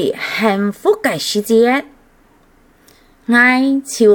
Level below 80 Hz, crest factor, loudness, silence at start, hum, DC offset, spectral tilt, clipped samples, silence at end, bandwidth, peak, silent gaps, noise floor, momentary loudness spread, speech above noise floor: -56 dBFS; 16 dB; -14 LUFS; 0 s; none; under 0.1%; -4 dB/octave; under 0.1%; 0 s; 19 kHz; 0 dBFS; none; -50 dBFS; 8 LU; 37 dB